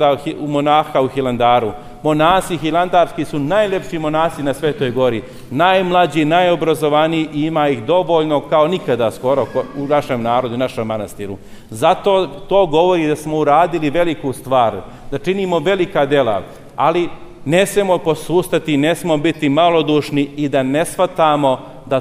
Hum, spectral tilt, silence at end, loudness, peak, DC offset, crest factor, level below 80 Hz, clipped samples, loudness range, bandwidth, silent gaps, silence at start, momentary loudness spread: none; -5.5 dB/octave; 0 s; -16 LUFS; 0 dBFS; under 0.1%; 14 dB; -42 dBFS; under 0.1%; 2 LU; 15.5 kHz; none; 0 s; 8 LU